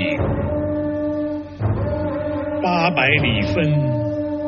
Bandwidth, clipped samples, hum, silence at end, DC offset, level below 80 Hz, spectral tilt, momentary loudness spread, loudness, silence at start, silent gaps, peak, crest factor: 6.6 kHz; under 0.1%; none; 0 s; under 0.1%; -36 dBFS; -5 dB/octave; 8 LU; -20 LUFS; 0 s; none; -2 dBFS; 18 dB